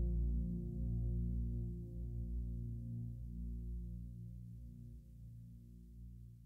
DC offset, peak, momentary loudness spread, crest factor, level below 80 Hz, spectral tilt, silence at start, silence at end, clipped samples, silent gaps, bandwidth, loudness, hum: under 0.1%; -28 dBFS; 16 LU; 14 dB; -44 dBFS; -11.5 dB/octave; 0 s; 0 s; under 0.1%; none; 0.7 kHz; -45 LUFS; 60 Hz at -65 dBFS